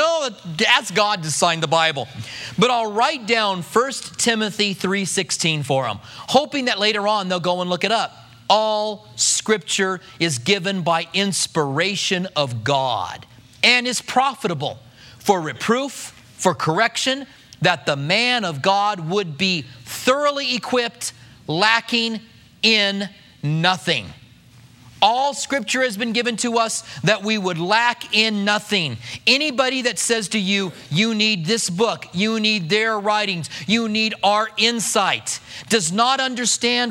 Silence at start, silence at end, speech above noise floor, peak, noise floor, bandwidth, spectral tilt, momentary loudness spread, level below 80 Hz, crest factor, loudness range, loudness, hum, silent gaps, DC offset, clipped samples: 0 s; 0 s; 27 dB; 0 dBFS; -47 dBFS; 16.5 kHz; -3 dB/octave; 9 LU; -62 dBFS; 20 dB; 2 LU; -19 LUFS; none; none; under 0.1%; under 0.1%